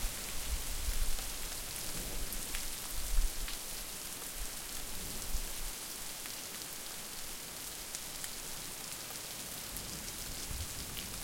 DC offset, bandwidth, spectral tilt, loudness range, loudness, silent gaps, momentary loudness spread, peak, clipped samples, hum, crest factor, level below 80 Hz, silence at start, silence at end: under 0.1%; 17 kHz; -1.5 dB/octave; 2 LU; -40 LUFS; none; 3 LU; -18 dBFS; under 0.1%; none; 20 dB; -42 dBFS; 0 s; 0 s